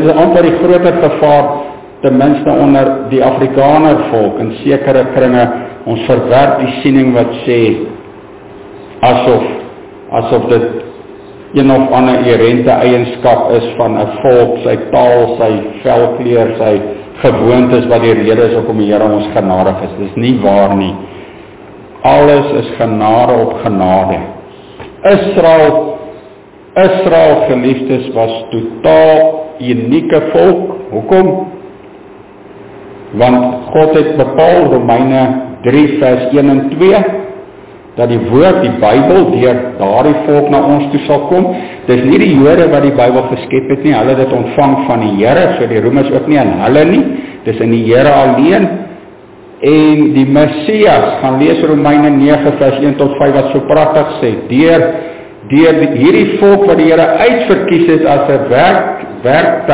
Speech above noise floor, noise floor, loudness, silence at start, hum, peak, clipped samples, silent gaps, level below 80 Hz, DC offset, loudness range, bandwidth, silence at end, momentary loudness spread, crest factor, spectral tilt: 27 dB; -35 dBFS; -9 LUFS; 0 s; none; 0 dBFS; 0.4%; none; -40 dBFS; 0.7%; 3 LU; 4 kHz; 0 s; 9 LU; 8 dB; -11 dB/octave